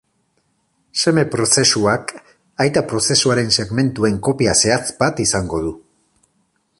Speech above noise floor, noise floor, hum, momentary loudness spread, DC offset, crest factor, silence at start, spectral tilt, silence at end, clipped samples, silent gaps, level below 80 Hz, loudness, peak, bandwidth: 48 dB; -65 dBFS; none; 10 LU; under 0.1%; 18 dB; 0.95 s; -3.5 dB/octave; 1 s; under 0.1%; none; -44 dBFS; -16 LUFS; 0 dBFS; 11.5 kHz